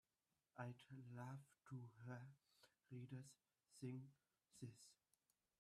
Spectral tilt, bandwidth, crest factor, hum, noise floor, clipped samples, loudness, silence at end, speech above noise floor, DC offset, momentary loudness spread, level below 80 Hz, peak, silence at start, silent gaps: -6.5 dB/octave; 13.5 kHz; 22 dB; none; under -90 dBFS; under 0.1%; -59 LUFS; 0.65 s; over 32 dB; under 0.1%; 11 LU; under -90 dBFS; -38 dBFS; 0.55 s; none